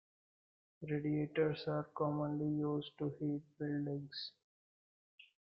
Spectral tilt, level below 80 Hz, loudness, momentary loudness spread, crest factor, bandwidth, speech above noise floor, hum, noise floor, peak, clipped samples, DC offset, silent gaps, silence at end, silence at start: -9.5 dB/octave; -78 dBFS; -40 LUFS; 8 LU; 18 dB; 5.6 kHz; over 51 dB; none; under -90 dBFS; -24 dBFS; under 0.1%; under 0.1%; 4.44-5.18 s; 0.15 s; 0.8 s